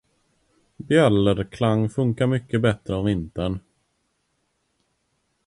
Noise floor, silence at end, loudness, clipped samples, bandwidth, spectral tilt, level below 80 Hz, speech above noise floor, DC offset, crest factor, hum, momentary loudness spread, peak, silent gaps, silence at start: -72 dBFS; 1.9 s; -22 LUFS; under 0.1%; 11 kHz; -7.5 dB/octave; -46 dBFS; 50 dB; under 0.1%; 20 dB; none; 10 LU; -4 dBFS; none; 0.8 s